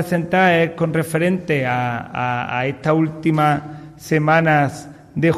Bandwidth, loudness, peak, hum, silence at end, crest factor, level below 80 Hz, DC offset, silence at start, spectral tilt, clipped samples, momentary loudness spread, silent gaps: 14.5 kHz; -18 LUFS; -4 dBFS; none; 0 s; 14 dB; -52 dBFS; under 0.1%; 0 s; -6.5 dB/octave; under 0.1%; 9 LU; none